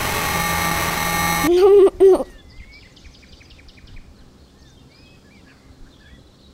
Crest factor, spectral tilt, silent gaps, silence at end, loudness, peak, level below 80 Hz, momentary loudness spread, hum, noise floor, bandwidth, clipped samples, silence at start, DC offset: 16 dB; -4 dB/octave; none; 0.7 s; -16 LUFS; -4 dBFS; -40 dBFS; 8 LU; none; -48 dBFS; 16.5 kHz; under 0.1%; 0 s; under 0.1%